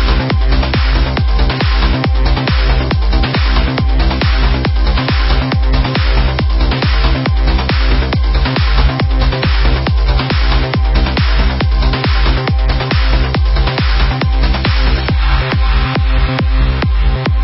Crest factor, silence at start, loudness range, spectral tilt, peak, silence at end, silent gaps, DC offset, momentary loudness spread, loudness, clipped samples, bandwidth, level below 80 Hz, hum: 12 dB; 0 s; 0 LU; -10 dB/octave; 0 dBFS; 0 s; none; under 0.1%; 1 LU; -14 LUFS; under 0.1%; 5.8 kHz; -12 dBFS; none